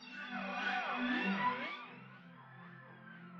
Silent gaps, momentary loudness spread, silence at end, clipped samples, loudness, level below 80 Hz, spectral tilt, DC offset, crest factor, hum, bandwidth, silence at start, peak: none; 20 LU; 0 s; under 0.1%; -38 LUFS; -82 dBFS; -5.5 dB/octave; under 0.1%; 16 dB; none; 7.2 kHz; 0 s; -24 dBFS